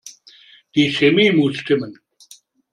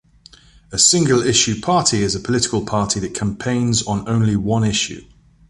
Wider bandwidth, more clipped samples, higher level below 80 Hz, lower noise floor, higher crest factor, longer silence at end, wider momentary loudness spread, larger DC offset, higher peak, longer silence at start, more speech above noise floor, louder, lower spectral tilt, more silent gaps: about the same, 11.5 kHz vs 11.5 kHz; neither; second, -62 dBFS vs -42 dBFS; about the same, -49 dBFS vs -48 dBFS; about the same, 18 dB vs 18 dB; first, 0.8 s vs 0.45 s; about the same, 9 LU vs 9 LU; neither; about the same, -2 dBFS vs 0 dBFS; second, 0.05 s vs 0.7 s; about the same, 33 dB vs 30 dB; about the same, -17 LUFS vs -17 LUFS; first, -5.5 dB/octave vs -3.5 dB/octave; neither